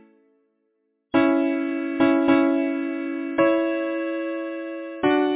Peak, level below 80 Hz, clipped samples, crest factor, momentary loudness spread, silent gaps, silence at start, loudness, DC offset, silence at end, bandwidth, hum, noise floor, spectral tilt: -6 dBFS; -62 dBFS; under 0.1%; 16 dB; 10 LU; none; 1.15 s; -23 LUFS; under 0.1%; 0 s; 4 kHz; none; -72 dBFS; -9.5 dB/octave